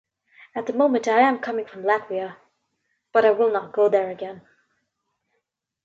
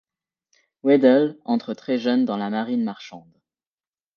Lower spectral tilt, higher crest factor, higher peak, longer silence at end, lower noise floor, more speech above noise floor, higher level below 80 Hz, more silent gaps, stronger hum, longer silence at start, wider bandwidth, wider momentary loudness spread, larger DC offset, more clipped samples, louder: second, -5 dB/octave vs -7 dB/octave; about the same, 20 dB vs 20 dB; about the same, -4 dBFS vs -4 dBFS; first, 1.45 s vs 0.95 s; second, -77 dBFS vs under -90 dBFS; second, 56 dB vs over 69 dB; about the same, -76 dBFS vs -76 dBFS; neither; neither; second, 0.55 s vs 0.85 s; first, 7.8 kHz vs 6.8 kHz; about the same, 14 LU vs 12 LU; neither; neither; about the same, -22 LUFS vs -21 LUFS